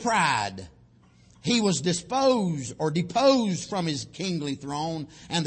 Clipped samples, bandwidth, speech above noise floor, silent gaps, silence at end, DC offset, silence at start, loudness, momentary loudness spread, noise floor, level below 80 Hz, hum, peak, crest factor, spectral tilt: under 0.1%; 8.8 kHz; 31 dB; none; 0 s; under 0.1%; 0 s; -26 LUFS; 10 LU; -57 dBFS; -60 dBFS; none; -8 dBFS; 18 dB; -4.5 dB/octave